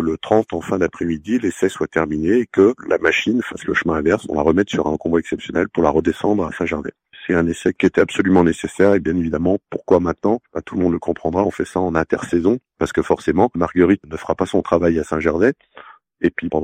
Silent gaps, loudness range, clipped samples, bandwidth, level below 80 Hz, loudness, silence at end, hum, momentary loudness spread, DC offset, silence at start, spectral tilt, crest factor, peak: none; 2 LU; under 0.1%; 14 kHz; -46 dBFS; -18 LUFS; 0 s; none; 6 LU; under 0.1%; 0 s; -6.5 dB/octave; 16 dB; -2 dBFS